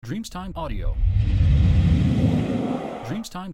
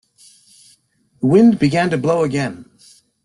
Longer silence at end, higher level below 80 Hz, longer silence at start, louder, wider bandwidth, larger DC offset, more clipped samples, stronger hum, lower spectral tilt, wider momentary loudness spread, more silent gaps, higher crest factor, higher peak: second, 0 s vs 0.6 s; first, -26 dBFS vs -54 dBFS; second, 0.05 s vs 1.2 s; second, -23 LUFS vs -16 LUFS; about the same, 12.5 kHz vs 11.5 kHz; neither; neither; neither; about the same, -8 dB/octave vs -7 dB/octave; about the same, 13 LU vs 12 LU; neither; about the same, 12 dB vs 16 dB; second, -8 dBFS vs -2 dBFS